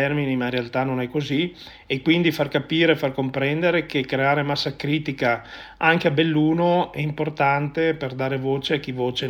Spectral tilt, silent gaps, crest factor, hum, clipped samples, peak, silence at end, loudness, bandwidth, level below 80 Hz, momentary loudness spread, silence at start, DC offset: -6.5 dB/octave; none; 18 dB; none; under 0.1%; -4 dBFS; 0 s; -22 LUFS; 16.5 kHz; -54 dBFS; 7 LU; 0 s; under 0.1%